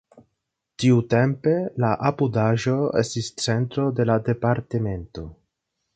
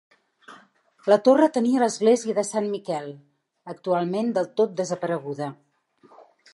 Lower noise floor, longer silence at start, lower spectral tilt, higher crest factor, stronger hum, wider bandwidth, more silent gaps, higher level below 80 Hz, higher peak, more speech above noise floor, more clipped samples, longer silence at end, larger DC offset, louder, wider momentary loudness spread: first, -79 dBFS vs -58 dBFS; second, 0.15 s vs 0.5 s; about the same, -6.5 dB/octave vs -5.5 dB/octave; about the same, 18 dB vs 20 dB; neither; second, 9.2 kHz vs 11.5 kHz; neither; first, -50 dBFS vs -80 dBFS; about the same, -4 dBFS vs -6 dBFS; first, 58 dB vs 35 dB; neither; second, 0.6 s vs 1 s; neither; about the same, -22 LUFS vs -23 LUFS; second, 8 LU vs 14 LU